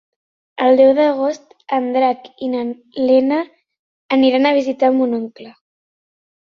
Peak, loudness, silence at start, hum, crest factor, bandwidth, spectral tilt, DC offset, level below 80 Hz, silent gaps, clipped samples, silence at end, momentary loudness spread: -2 dBFS; -16 LUFS; 0.6 s; none; 16 dB; 6.8 kHz; -5 dB/octave; under 0.1%; -64 dBFS; 3.79-4.09 s; under 0.1%; 0.95 s; 13 LU